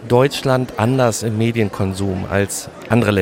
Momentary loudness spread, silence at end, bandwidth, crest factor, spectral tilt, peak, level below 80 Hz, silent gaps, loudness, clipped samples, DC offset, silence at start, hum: 6 LU; 0 s; 16.5 kHz; 16 dB; -5.5 dB/octave; 0 dBFS; -46 dBFS; none; -18 LUFS; under 0.1%; under 0.1%; 0 s; none